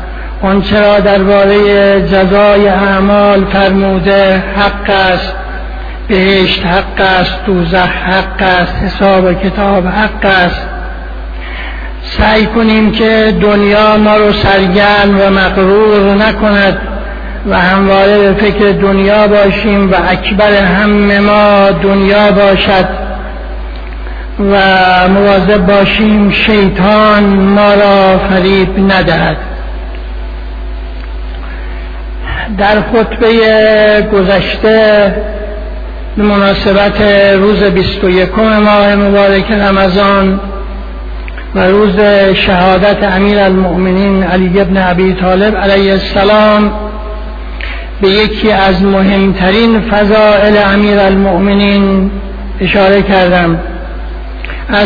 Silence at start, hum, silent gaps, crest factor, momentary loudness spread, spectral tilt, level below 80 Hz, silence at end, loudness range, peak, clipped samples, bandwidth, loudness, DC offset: 0 s; none; none; 8 dB; 16 LU; -8 dB/octave; -22 dBFS; 0 s; 4 LU; 0 dBFS; 0.2%; 5.4 kHz; -7 LUFS; under 0.1%